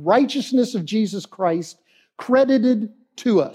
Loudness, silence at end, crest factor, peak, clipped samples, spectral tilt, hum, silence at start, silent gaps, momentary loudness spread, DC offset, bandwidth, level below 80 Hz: -20 LUFS; 0 s; 16 dB; -4 dBFS; under 0.1%; -6 dB/octave; none; 0 s; none; 11 LU; under 0.1%; 12.5 kHz; -76 dBFS